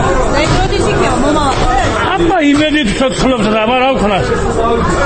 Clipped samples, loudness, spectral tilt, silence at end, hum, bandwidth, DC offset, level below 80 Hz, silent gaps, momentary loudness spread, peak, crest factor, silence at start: under 0.1%; -12 LUFS; -5 dB/octave; 0 s; none; 8.8 kHz; under 0.1%; -20 dBFS; none; 3 LU; 0 dBFS; 12 dB; 0 s